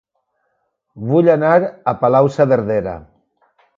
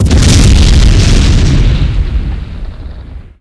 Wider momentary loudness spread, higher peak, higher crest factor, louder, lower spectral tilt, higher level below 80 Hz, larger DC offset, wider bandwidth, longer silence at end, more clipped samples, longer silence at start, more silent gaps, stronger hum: second, 14 LU vs 20 LU; about the same, 0 dBFS vs -2 dBFS; first, 16 dB vs 6 dB; second, -15 LUFS vs -9 LUFS; first, -9 dB/octave vs -5 dB/octave; second, -50 dBFS vs -10 dBFS; neither; second, 7.4 kHz vs 11 kHz; first, 0.8 s vs 0.15 s; neither; first, 0.95 s vs 0 s; neither; neither